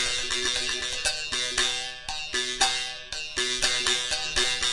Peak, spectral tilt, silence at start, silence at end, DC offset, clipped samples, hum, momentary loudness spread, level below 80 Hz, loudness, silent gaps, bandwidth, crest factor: -6 dBFS; 0.5 dB/octave; 0 s; 0 s; under 0.1%; under 0.1%; none; 8 LU; -48 dBFS; -25 LUFS; none; 11.5 kHz; 20 dB